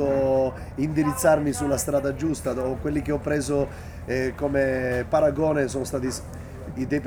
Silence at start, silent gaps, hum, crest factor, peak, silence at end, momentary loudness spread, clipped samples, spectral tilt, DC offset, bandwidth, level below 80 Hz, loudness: 0 s; none; none; 18 dB; -8 dBFS; 0 s; 10 LU; under 0.1%; -6 dB/octave; under 0.1%; over 20 kHz; -42 dBFS; -25 LUFS